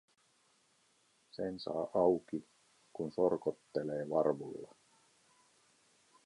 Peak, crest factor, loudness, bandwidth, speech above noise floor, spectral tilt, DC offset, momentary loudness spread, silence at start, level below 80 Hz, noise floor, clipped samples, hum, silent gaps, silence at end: -16 dBFS; 22 dB; -36 LUFS; 11.5 kHz; 37 dB; -7.5 dB/octave; under 0.1%; 17 LU; 1.35 s; -74 dBFS; -73 dBFS; under 0.1%; none; none; 1.6 s